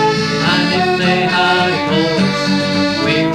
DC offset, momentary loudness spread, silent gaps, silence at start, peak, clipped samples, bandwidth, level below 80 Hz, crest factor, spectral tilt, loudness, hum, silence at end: under 0.1%; 2 LU; none; 0 s; -2 dBFS; under 0.1%; 13 kHz; -46 dBFS; 12 dB; -5 dB/octave; -14 LUFS; none; 0 s